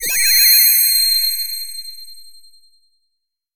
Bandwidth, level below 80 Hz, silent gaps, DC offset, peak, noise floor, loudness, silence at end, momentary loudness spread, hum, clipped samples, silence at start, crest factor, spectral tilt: 17 kHz; -58 dBFS; none; under 0.1%; -2 dBFS; -75 dBFS; -10 LUFS; 1.35 s; 20 LU; none; under 0.1%; 0 s; 16 dB; 4.5 dB/octave